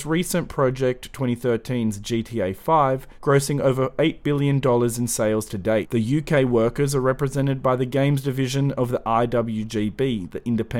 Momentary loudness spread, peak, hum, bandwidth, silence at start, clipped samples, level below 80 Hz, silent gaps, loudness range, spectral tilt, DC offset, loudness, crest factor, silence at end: 6 LU; -6 dBFS; none; 17 kHz; 0 s; under 0.1%; -44 dBFS; none; 2 LU; -6 dB/octave; under 0.1%; -22 LUFS; 16 dB; 0 s